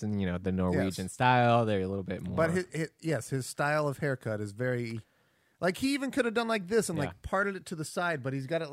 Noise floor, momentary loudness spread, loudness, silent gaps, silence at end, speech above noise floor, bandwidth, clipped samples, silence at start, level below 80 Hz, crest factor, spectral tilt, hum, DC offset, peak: -70 dBFS; 9 LU; -31 LUFS; none; 0 s; 39 dB; 16 kHz; under 0.1%; 0 s; -60 dBFS; 20 dB; -5.5 dB/octave; none; under 0.1%; -10 dBFS